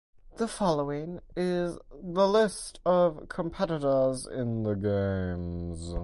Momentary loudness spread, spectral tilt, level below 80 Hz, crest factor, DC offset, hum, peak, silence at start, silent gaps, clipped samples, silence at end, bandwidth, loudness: 11 LU; -6 dB/octave; -46 dBFS; 16 dB; under 0.1%; none; -12 dBFS; 0.25 s; none; under 0.1%; 0 s; 11.5 kHz; -29 LUFS